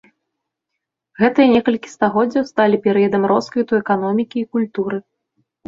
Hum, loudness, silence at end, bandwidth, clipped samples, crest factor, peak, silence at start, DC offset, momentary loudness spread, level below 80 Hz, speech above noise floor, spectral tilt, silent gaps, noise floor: none; -17 LUFS; 0.7 s; 7.6 kHz; under 0.1%; 16 dB; -2 dBFS; 1.2 s; under 0.1%; 8 LU; -60 dBFS; 63 dB; -7 dB/octave; none; -79 dBFS